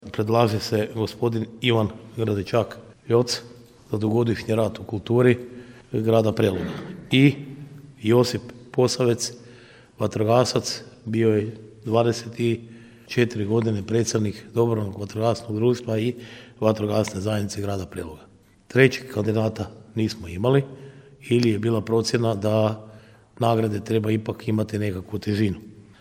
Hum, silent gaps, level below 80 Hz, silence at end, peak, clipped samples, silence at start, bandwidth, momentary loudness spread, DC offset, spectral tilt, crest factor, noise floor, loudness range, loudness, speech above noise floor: none; none; -56 dBFS; 0.2 s; 0 dBFS; under 0.1%; 0 s; 16.5 kHz; 12 LU; under 0.1%; -6 dB/octave; 22 dB; -48 dBFS; 2 LU; -23 LUFS; 26 dB